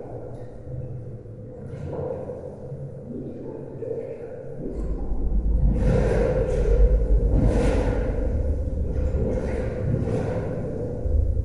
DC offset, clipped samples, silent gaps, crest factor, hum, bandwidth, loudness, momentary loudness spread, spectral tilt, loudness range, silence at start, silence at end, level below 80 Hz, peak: under 0.1%; under 0.1%; none; 16 dB; none; 10.5 kHz; -26 LUFS; 15 LU; -9 dB/octave; 12 LU; 0 s; 0 s; -26 dBFS; -6 dBFS